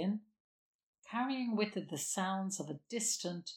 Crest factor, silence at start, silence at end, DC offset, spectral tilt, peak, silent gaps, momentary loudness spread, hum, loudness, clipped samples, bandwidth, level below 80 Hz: 20 dB; 0 s; 0 s; under 0.1%; -3.5 dB/octave; -20 dBFS; 0.40-0.94 s; 7 LU; none; -37 LUFS; under 0.1%; 17.5 kHz; -88 dBFS